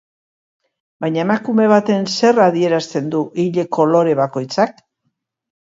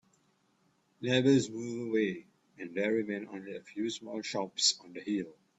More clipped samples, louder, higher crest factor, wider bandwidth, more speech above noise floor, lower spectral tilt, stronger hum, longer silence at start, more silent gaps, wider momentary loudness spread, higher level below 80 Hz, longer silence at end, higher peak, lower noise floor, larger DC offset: neither; first, -16 LUFS vs -32 LUFS; second, 16 dB vs 22 dB; about the same, 7.8 kHz vs 8.4 kHz; first, 56 dB vs 40 dB; first, -6 dB/octave vs -4 dB/octave; neither; about the same, 1 s vs 1 s; neither; second, 7 LU vs 15 LU; first, -66 dBFS vs -74 dBFS; first, 1.05 s vs 0.25 s; first, 0 dBFS vs -12 dBFS; about the same, -71 dBFS vs -72 dBFS; neither